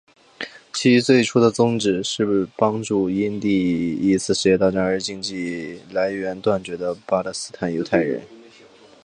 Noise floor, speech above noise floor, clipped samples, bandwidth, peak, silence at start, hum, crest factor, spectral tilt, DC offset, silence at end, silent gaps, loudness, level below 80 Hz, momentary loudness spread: -48 dBFS; 28 dB; under 0.1%; 10.5 kHz; -2 dBFS; 0.4 s; none; 20 dB; -5 dB/octave; under 0.1%; 0.65 s; none; -21 LUFS; -54 dBFS; 11 LU